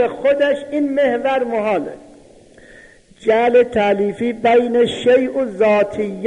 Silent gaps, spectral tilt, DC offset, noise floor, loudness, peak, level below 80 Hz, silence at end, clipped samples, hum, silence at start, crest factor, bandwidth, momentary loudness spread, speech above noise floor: none; -6 dB/octave; under 0.1%; -45 dBFS; -16 LUFS; -4 dBFS; -52 dBFS; 0 s; under 0.1%; none; 0 s; 14 dB; 10.5 kHz; 7 LU; 29 dB